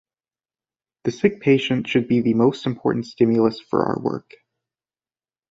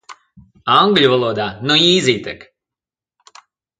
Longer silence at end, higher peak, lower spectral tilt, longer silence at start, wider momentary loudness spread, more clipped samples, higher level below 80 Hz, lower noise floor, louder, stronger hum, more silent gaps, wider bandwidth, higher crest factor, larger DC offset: second, 1.3 s vs 1.45 s; about the same, -2 dBFS vs 0 dBFS; first, -7 dB/octave vs -4 dB/octave; first, 1.05 s vs 0.1 s; second, 9 LU vs 16 LU; neither; about the same, -60 dBFS vs -56 dBFS; about the same, under -90 dBFS vs -88 dBFS; second, -21 LUFS vs -14 LUFS; neither; neither; second, 7.8 kHz vs 9.4 kHz; about the same, 20 dB vs 18 dB; neither